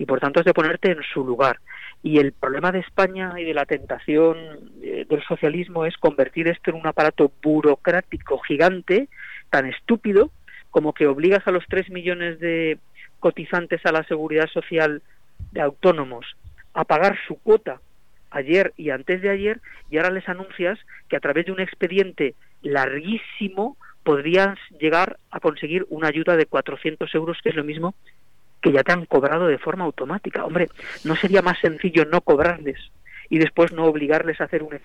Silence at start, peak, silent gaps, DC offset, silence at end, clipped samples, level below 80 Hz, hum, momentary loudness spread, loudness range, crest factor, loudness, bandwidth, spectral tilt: 0 s; -6 dBFS; none; 0.5%; 0.05 s; under 0.1%; -52 dBFS; none; 10 LU; 3 LU; 16 dB; -21 LUFS; 8.8 kHz; -7 dB/octave